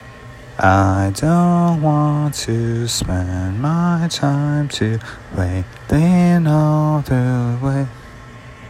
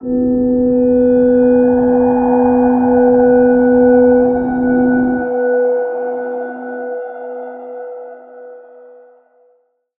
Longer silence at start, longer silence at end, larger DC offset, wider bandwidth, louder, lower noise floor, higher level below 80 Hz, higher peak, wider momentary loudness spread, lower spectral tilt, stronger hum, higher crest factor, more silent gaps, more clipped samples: about the same, 0 s vs 0 s; second, 0 s vs 1.4 s; neither; first, 15 kHz vs 2.6 kHz; second, -17 LUFS vs -12 LUFS; second, -37 dBFS vs -57 dBFS; about the same, -40 dBFS vs -42 dBFS; about the same, -2 dBFS vs -2 dBFS; second, 13 LU vs 17 LU; second, -6.5 dB/octave vs -13 dB/octave; neither; about the same, 16 dB vs 12 dB; neither; neither